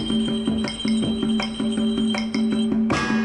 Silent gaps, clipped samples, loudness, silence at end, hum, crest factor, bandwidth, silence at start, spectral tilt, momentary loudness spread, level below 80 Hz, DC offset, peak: none; under 0.1%; -23 LUFS; 0 s; none; 12 dB; 10.5 kHz; 0 s; -5 dB/octave; 2 LU; -46 dBFS; under 0.1%; -10 dBFS